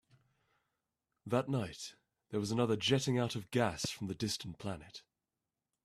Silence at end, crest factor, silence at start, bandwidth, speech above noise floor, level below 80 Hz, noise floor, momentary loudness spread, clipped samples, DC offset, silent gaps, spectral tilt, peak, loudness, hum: 0.85 s; 22 dB; 1.25 s; 14.5 kHz; over 54 dB; -68 dBFS; under -90 dBFS; 16 LU; under 0.1%; under 0.1%; none; -5 dB/octave; -16 dBFS; -36 LUFS; none